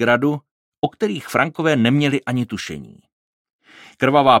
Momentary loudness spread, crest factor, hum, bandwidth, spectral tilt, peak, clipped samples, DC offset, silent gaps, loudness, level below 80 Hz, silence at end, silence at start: 13 LU; 18 dB; none; 16 kHz; -6 dB/octave; -2 dBFS; under 0.1%; under 0.1%; 0.51-0.72 s, 0.78-0.82 s, 3.13-3.45 s, 3.53-3.59 s; -19 LUFS; -58 dBFS; 0 s; 0 s